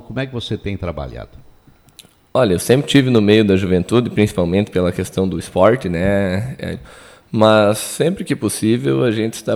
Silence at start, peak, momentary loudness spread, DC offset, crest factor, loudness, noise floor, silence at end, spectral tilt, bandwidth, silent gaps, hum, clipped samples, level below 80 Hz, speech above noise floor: 0.1 s; 0 dBFS; 13 LU; under 0.1%; 16 dB; -16 LUFS; -48 dBFS; 0 s; -6 dB/octave; 16 kHz; none; none; under 0.1%; -42 dBFS; 32 dB